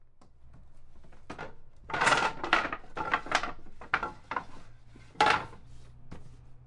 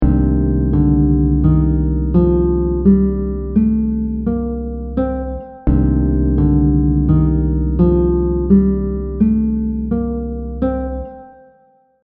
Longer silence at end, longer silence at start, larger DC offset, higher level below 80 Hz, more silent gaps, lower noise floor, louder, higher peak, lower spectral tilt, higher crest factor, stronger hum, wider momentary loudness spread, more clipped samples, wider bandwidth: second, 0 s vs 0.75 s; about the same, 0 s vs 0 s; neither; second, -52 dBFS vs -20 dBFS; neither; about the same, -52 dBFS vs -53 dBFS; second, -30 LUFS vs -16 LUFS; second, -8 dBFS vs 0 dBFS; second, -2.5 dB/octave vs -12.5 dB/octave; first, 26 dB vs 14 dB; neither; first, 25 LU vs 9 LU; neither; first, 11.5 kHz vs 2.5 kHz